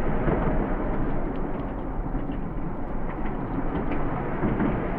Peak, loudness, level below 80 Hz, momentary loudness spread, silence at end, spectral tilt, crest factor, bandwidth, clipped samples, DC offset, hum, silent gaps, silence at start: -10 dBFS; -29 LUFS; -30 dBFS; 7 LU; 0 s; -11 dB/octave; 16 dB; 3.5 kHz; under 0.1%; under 0.1%; none; none; 0 s